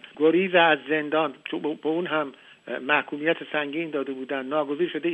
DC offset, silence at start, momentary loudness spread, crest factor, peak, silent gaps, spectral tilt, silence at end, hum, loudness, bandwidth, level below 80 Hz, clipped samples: under 0.1%; 0.05 s; 11 LU; 18 dB; -6 dBFS; none; -7 dB/octave; 0 s; none; -25 LUFS; 8.2 kHz; -78 dBFS; under 0.1%